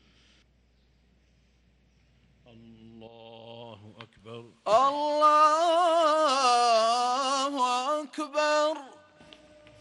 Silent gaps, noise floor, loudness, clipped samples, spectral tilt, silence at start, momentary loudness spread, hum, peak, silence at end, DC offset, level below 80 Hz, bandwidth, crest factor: none; -65 dBFS; -24 LUFS; under 0.1%; -2 dB/octave; 2.95 s; 24 LU; none; -12 dBFS; 0.9 s; under 0.1%; -70 dBFS; 12 kHz; 16 dB